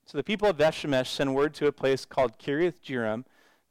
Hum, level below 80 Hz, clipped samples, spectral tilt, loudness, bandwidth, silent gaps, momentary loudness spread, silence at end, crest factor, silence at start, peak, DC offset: none; -56 dBFS; under 0.1%; -5.5 dB/octave; -27 LUFS; 15 kHz; none; 7 LU; 0.5 s; 12 dB; 0.1 s; -16 dBFS; under 0.1%